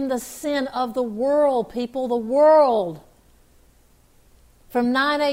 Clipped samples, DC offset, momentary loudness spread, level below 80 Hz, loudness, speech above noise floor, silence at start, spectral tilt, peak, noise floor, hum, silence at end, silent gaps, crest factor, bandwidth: under 0.1%; under 0.1%; 12 LU; -56 dBFS; -21 LUFS; 35 dB; 0 s; -4.5 dB/octave; -8 dBFS; -55 dBFS; none; 0 s; none; 14 dB; 16 kHz